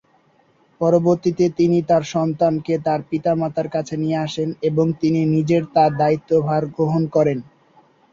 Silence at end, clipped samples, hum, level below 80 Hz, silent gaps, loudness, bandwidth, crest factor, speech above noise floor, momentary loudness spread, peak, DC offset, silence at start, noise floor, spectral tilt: 0.7 s; under 0.1%; none; -56 dBFS; none; -19 LUFS; 7.6 kHz; 16 dB; 39 dB; 6 LU; -4 dBFS; under 0.1%; 0.8 s; -58 dBFS; -8 dB/octave